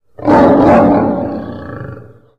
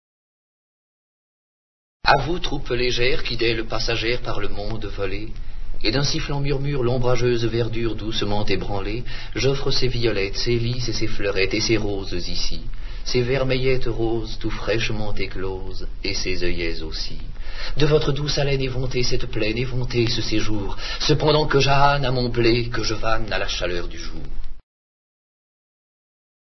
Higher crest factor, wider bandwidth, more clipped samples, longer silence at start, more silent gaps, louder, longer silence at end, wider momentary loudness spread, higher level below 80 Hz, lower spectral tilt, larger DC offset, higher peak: second, 10 dB vs 20 dB; first, 7.8 kHz vs 6.2 kHz; neither; second, 0.2 s vs 2.05 s; neither; first, -10 LUFS vs -23 LUFS; second, 0.35 s vs 1.95 s; first, 20 LU vs 11 LU; second, -36 dBFS vs -28 dBFS; first, -9 dB/octave vs -5 dB/octave; first, 0.7% vs under 0.1%; about the same, -2 dBFS vs 0 dBFS